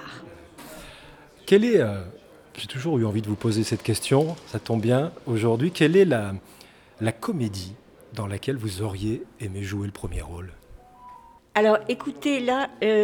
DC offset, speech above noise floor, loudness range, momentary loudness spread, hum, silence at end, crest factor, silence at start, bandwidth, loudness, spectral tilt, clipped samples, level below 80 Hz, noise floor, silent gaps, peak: under 0.1%; 25 dB; 9 LU; 21 LU; none; 0 s; 20 dB; 0 s; 19 kHz; -24 LUFS; -6 dB/octave; under 0.1%; -50 dBFS; -48 dBFS; none; -4 dBFS